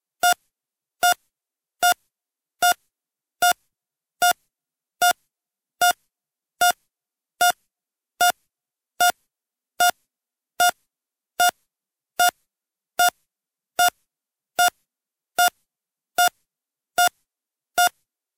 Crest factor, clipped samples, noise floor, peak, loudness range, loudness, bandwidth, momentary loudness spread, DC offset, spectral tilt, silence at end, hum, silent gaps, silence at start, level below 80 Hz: 20 dB; under 0.1%; -89 dBFS; -4 dBFS; 1 LU; -22 LUFS; 17 kHz; 8 LU; under 0.1%; 1.5 dB/octave; 0.5 s; none; none; 0.25 s; -72 dBFS